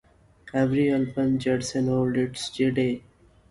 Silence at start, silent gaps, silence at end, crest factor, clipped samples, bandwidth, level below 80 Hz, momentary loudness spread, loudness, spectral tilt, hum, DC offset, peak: 0.45 s; none; 0.5 s; 14 dB; under 0.1%; 11.5 kHz; -54 dBFS; 6 LU; -25 LUFS; -6 dB/octave; none; under 0.1%; -10 dBFS